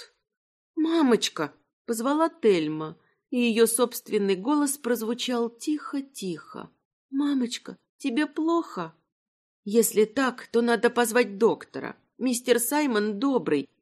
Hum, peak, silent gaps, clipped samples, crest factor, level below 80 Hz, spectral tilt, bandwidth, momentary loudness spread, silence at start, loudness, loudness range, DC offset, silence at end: none; -6 dBFS; 0.37-0.74 s, 1.73-1.85 s, 6.85-7.09 s, 7.89-7.99 s, 9.12-9.63 s; under 0.1%; 20 dB; -80 dBFS; -3.5 dB/octave; 14.5 kHz; 14 LU; 0 s; -25 LUFS; 5 LU; under 0.1%; 0.15 s